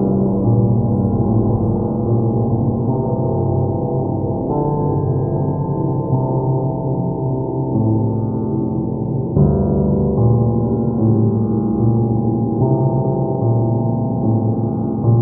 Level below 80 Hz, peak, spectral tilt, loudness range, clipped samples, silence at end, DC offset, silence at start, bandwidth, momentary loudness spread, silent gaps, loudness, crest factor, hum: -36 dBFS; -2 dBFS; -17 dB/octave; 3 LU; under 0.1%; 0 s; under 0.1%; 0 s; 1.6 kHz; 5 LU; none; -17 LUFS; 14 dB; none